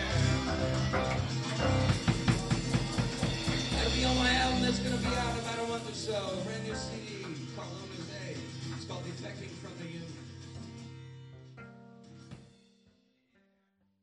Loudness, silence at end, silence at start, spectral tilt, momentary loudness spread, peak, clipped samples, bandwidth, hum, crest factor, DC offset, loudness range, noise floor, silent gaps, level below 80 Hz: -32 LUFS; 1.55 s; 0 s; -5 dB/octave; 21 LU; -14 dBFS; under 0.1%; 12 kHz; none; 20 dB; under 0.1%; 18 LU; -74 dBFS; none; -44 dBFS